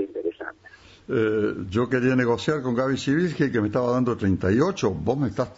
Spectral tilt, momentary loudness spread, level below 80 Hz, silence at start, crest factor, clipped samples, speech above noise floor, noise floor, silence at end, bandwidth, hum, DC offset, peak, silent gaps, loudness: -7 dB/octave; 7 LU; -52 dBFS; 0 s; 16 dB; under 0.1%; 27 dB; -50 dBFS; 0.05 s; 8 kHz; none; under 0.1%; -8 dBFS; none; -24 LUFS